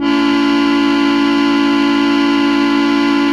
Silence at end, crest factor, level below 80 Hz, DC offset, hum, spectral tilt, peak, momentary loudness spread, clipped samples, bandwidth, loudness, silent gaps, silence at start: 0 s; 10 dB; -46 dBFS; under 0.1%; none; -4 dB/octave; -2 dBFS; 0 LU; under 0.1%; 9.8 kHz; -13 LUFS; none; 0 s